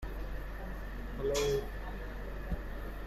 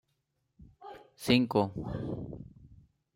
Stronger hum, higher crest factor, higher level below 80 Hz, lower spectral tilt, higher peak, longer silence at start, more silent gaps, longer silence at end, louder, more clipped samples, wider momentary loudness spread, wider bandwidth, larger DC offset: neither; second, 16 dB vs 22 dB; first, -40 dBFS vs -56 dBFS; second, -4.5 dB/octave vs -6 dB/octave; second, -22 dBFS vs -12 dBFS; second, 0 s vs 0.6 s; neither; second, 0 s vs 0.4 s; second, -39 LUFS vs -31 LUFS; neither; second, 11 LU vs 24 LU; about the same, 15 kHz vs 16 kHz; neither